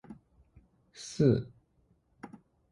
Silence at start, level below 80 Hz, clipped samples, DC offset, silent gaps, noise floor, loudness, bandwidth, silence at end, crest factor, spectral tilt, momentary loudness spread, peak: 0.1 s; -60 dBFS; under 0.1%; under 0.1%; none; -70 dBFS; -29 LUFS; 11.5 kHz; 0.45 s; 22 dB; -7.5 dB/octave; 26 LU; -12 dBFS